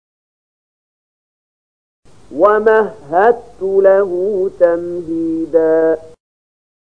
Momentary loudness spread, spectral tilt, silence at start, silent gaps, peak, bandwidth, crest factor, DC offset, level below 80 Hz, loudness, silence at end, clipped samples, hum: 9 LU; -7.5 dB/octave; 2.3 s; none; 0 dBFS; 8.8 kHz; 16 dB; 0.7%; -54 dBFS; -14 LUFS; 0.8 s; under 0.1%; none